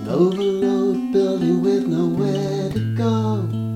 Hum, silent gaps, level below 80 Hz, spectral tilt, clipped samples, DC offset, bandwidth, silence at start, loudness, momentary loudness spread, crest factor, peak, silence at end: none; none; -52 dBFS; -8 dB/octave; under 0.1%; under 0.1%; 13 kHz; 0 s; -20 LUFS; 5 LU; 14 dB; -6 dBFS; 0 s